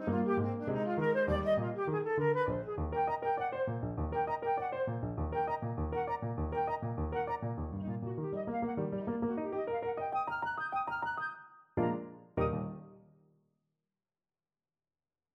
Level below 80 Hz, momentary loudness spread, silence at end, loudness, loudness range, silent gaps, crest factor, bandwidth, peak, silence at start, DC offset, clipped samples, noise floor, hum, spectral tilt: -50 dBFS; 7 LU; 2.35 s; -35 LUFS; 6 LU; none; 16 dB; 6.2 kHz; -18 dBFS; 0 s; under 0.1%; under 0.1%; under -90 dBFS; none; -9.5 dB/octave